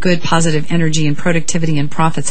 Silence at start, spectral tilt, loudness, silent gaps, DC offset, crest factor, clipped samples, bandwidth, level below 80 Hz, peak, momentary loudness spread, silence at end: 0 s; -5 dB/octave; -16 LUFS; none; 20%; 16 dB; under 0.1%; 9 kHz; -42 dBFS; 0 dBFS; 3 LU; 0 s